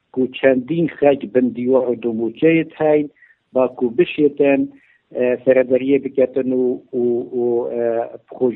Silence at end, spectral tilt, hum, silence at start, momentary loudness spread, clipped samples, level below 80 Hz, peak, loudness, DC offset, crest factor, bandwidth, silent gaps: 0 s; -11 dB/octave; none; 0.15 s; 6 LU; under 0.1%; -62 dBFS; 0 dBFS; -18 LUFS; under 0.1%; 16 dB; 4 kHz; none